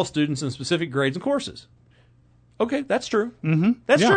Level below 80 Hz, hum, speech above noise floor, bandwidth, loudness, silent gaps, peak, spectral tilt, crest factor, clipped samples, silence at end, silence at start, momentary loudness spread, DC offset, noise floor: -60 dBFS; none; 34 dB; 9.4 kHz; -24 LUFS; none; -6 dBFS; -5.5 dB/octave; 18 dB; under 0.1%; 0 s; 0 s; 8 LU; under 0.1%; -57 dBFS